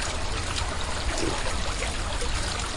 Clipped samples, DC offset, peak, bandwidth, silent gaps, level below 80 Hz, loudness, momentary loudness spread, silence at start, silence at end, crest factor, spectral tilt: under 0.1%; under 0.1%; -12 dBFS; 11.5 kHz; none; -32 dBFS; -29 LUFS; 2 LU; 0 s; 0 s; 14 dB; -3 dB/octave